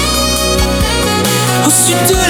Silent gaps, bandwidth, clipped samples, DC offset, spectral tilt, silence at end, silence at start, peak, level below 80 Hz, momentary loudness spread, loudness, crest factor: none; over 20 kHz; under 0.1%; under 0.1%; -3 dB/octave; 0 s; 0 s; 0 dBFS; -22 dBFS; 4 LU; -10 LUFS; 12 dB